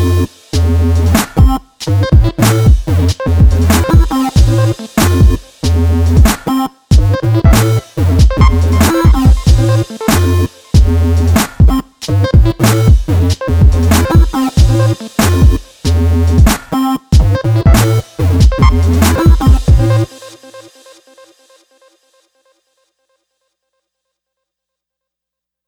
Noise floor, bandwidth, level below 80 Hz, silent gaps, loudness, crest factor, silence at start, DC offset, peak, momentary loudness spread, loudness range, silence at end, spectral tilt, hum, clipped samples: -82 dBFS; 19.5 kHz; -14 dBFS; none; -11 LUFS; 10 dB; 0 s; under 0.1%; 0 dBFS; 5 LU; 2 LU; 5.05 s; -6 dB/octave; 60 Hz at -30 dBFS; under 0.1%